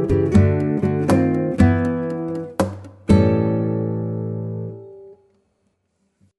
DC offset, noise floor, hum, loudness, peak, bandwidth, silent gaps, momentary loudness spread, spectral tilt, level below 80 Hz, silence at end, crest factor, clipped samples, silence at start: under 0.1%; -69 dBFS; none; -20 LUFS; -2 dBFS; 11.5 kHz; none; 12 LU; -8.5 dB/octave; -38 dBFS; 1.25 s; 18 dB; under 0.1%; 0 s